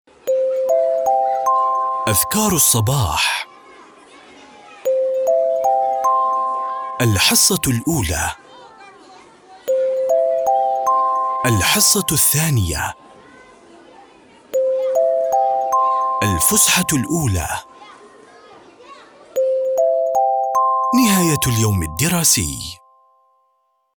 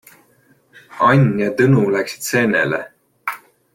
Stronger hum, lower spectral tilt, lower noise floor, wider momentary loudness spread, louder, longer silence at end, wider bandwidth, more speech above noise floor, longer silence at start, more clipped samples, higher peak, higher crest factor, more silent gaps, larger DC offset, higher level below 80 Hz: neither; second, -3.5 dB/octave vs -6 dB/octave; first, -65 dBFS vs -56 dBFS; second, 9 LU vs 15 LU; about the same, -16 LUFS vs -17 LUFS; first, 1.2 s vs 0.35 s; first, over 20 kHz vs 17 kHz; first, 48 dB vs 40 dB; second, 0.25 s vs 0.9 s; neither; about the same, -2 dBFS vs -2 dBFS; about the same, 16 dB vs 16 dB; neither; neither; first, -40 dBFS vs -56 dBFS